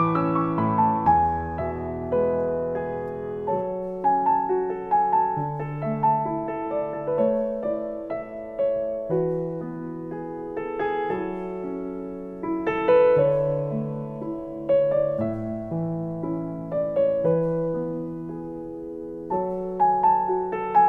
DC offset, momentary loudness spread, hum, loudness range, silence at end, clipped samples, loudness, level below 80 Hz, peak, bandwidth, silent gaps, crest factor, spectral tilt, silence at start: under 0.1%; 12 LU; none; 5 LU; 0 s; under 0.1%; -25 LUFS; -52 dBFS; -8 dBFS; 4.3 kHz; none; 16 dB; -10 dB/octave; 0 s